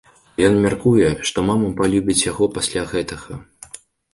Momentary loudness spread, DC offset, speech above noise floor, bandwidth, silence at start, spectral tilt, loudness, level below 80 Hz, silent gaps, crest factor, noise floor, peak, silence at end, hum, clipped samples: 20 LU; under 0.1%; 24 dB; 11.5 kHz; 0.4 s; -4.5 dB/octave; -18 LUFS; -42 dBFS; none; 18 dB; -42 dBFS; -2 dBFS; 0.35 s; none; under 0.1%